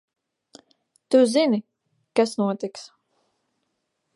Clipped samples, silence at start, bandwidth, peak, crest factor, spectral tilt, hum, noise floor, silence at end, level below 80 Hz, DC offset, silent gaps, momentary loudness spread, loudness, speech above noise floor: under 0.1%; 1.1 s; 11.5 kHz; -6 dBFS; 20 dB; -5 dB/octave; none; -76 dBFS; 1.3 s; -82 dBFS; under 0.1%; none; 14 LU; -22 LUFS; 56 dB